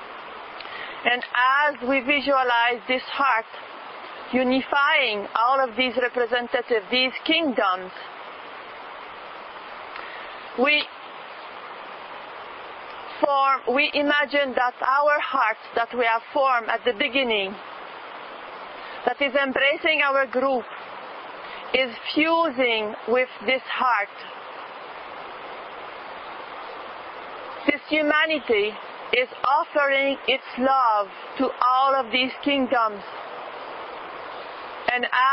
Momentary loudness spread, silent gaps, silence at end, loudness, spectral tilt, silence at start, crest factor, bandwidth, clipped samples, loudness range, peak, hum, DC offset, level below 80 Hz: 17 LU; none; 0 s; -22 LUFS; -7 dB/octave; 0 s; 22 dB; 5.8 kHz; under 0.1%; 6 LU; -4 dBFS; none; under 0.1%; -66 dBFS